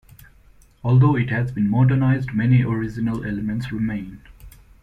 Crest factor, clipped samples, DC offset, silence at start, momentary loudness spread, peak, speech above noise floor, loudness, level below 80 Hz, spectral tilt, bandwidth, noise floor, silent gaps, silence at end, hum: 16 dB; under 0.1%; under 0.1%; 0.85 s; 9 LU; -6 dBFS; 32 dB; -20 LUFS; -44 dBFS; -9.5 dB/octave; 4.5 kHz; -51 dBFS; none; 0.35 s; none